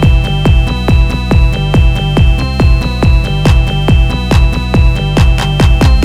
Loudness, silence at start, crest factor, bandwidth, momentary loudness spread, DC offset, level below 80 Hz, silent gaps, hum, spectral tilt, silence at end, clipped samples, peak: -11 LUFS; 0 s; 8 dB; 12 kHz; 1 LU; 0.2%; -10 dBFS; none; none; -6.5 dB/octave; 0 s; 0.3%; 0 dBFS